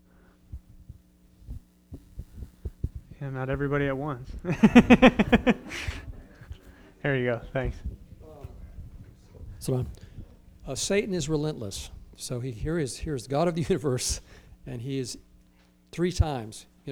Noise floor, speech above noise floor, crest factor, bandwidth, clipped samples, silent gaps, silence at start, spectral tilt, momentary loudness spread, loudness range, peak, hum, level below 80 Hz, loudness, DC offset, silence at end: -60 dBFS; 35 dB; 26 dB; 16 kHz; under 0.1%; none; 0.5 s; -5.5 dB/octave; 24 LU; 13 LU; -2 dBFS; none; -42 dBFS; -26 LUFS; under 0.1%; 0 s